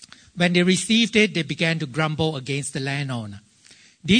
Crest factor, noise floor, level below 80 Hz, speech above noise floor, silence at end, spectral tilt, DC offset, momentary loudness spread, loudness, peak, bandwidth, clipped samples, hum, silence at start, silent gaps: 18 dB; -52 dBFS; -54 dBFS; 31 dB; 0 s; -4.5 dB/octave; under 0.1%; 13 LU; -21 LUFS; -4 dBFS; 9.6 kHz; under 0.1%; none; 0 s; none